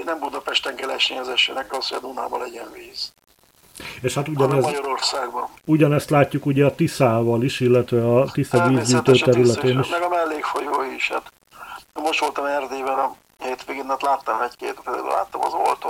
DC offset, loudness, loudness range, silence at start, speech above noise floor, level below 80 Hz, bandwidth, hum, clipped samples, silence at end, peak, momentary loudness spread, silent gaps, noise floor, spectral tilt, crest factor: under 0.1%; -21 LUFS; 7 LU; 0 s; 31 dB; -58 dBFS; 17 kHz; none; under 0.1%; 0 s; -2 dBFS; 13 LU; none; -51 dBFS; -5 dB/octave; 20 dB